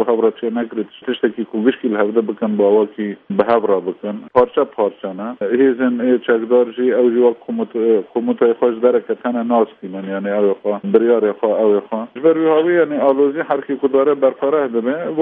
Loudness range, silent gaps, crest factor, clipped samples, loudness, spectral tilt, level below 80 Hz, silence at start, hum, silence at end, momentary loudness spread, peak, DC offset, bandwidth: 2 LU; none; 16 dB; under 0.1%; -17 LUFS; -10 dB/octave; -64 dBFS; 0 s; none; 0 s; 8 LU; 0 dBFS; under 0.1%; 3.9 kHz